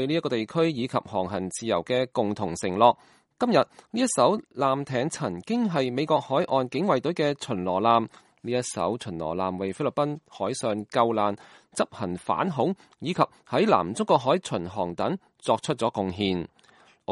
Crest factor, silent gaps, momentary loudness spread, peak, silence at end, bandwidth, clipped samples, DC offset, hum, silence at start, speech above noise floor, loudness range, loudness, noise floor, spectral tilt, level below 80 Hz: 22 dB; none; 9 LU; -4 dBFS; 0 s; 11.5 kHz; under 0.1%; under 0.1%; none; 0 s; 32 dB; 3 LU; -26 LUFS; -58 dBFS; -5 dB/octave; -64 dBFS